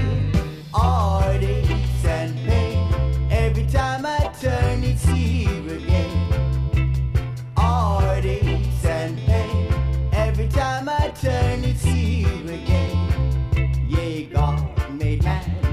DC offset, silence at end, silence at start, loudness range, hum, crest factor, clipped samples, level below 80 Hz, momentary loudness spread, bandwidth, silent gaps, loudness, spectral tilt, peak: under 0.1%; 0 s; 0 s; 1 LU; none; 14 dB; under 0.1%; -24 dBFS; 4 LU; 13.5 kHz; none; -22 LUFS; -7 dB/octave; -6 dBFS